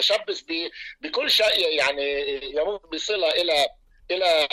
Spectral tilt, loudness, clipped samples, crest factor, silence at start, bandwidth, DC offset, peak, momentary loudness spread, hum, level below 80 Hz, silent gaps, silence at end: -1 dB/octave; -23 LUFS; under 0.1%; 12 dB; 0 s; 15.5 kHz; under 0.1%; -12 dBFS; 10 LU; none; -56 dBFS; none; 0.05 s